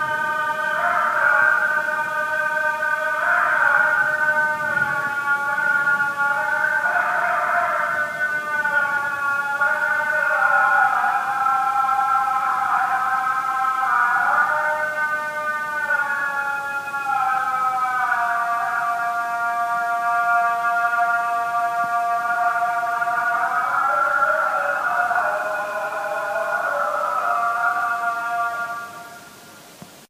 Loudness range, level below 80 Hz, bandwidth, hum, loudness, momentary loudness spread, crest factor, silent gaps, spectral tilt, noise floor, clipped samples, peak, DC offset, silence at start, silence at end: 3 LU; -74 dBFS; 15.5 kHz; none; -20 LUFS; 6 LU; 16 dB; none; -2.5 dB/octave; -43 dBFS; under 0.1%; -6 dBFS; under 0.1%; 0 s; 0.05 s